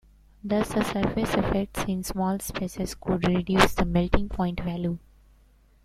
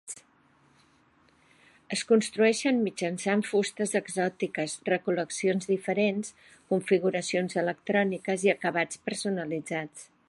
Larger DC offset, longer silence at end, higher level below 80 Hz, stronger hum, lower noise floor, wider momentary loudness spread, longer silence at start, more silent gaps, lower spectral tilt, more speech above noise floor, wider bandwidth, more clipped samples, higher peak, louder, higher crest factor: neither; first, 0.85 s vs 0.25 s; first, -38 dBFS vs -74 dBFS; neither; second, -58 dBFS vs -64 dBFS; about the same, 10 LU vs 8 LU; first, 0.45 s vs 0.05 s; neither; about the same, -5.5 dB/octave vs -4.5 dB/octave; about the same, 33 dB vs 36 dB; first, 15.5 kHz vs 11.5 kHz; neither; first, -2 dBFS vs -10 dBFS; about the same, -26 LUFS vs -28 LUFS; first, 26 dB vs 20 dB